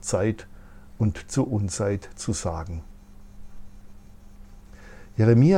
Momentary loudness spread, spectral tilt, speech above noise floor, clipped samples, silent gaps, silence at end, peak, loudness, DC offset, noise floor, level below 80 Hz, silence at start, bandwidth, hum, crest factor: 17 LU; -6.5 dB/octave; 22 dB; under 0.1%; none; 0 s; -6 dBFS; -26 LUFS; under 0.1%; -45 dBFS; -46 dBFS; 0 s; 11.5 kHz; none; 18 dB